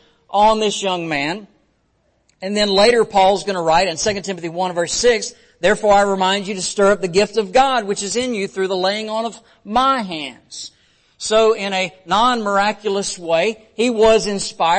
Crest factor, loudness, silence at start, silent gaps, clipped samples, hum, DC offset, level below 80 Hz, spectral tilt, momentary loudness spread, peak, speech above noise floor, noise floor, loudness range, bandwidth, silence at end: 14 dB; -17 LUFS; 0.3 s; none; under 0.1%; none; under 0.1%; -46 dBFS; -3 dB/octave; 10 LU; -2 dBFS; 46 dB; -63 dBFS; 3 LU; 8.8 kHz; 0 s